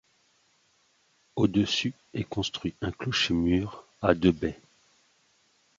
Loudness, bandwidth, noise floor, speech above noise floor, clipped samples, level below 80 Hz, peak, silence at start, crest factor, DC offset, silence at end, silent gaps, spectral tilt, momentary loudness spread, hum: -28 LUFS; 7.8 kHz; -68 dBFS; 41 dB; under 0.1%; -48 dBFS; -6 dBFS; 1.35 s; 24 dB; under 0.1%; 1.25 s; none; -5.5 dB/octave; 11 LU; none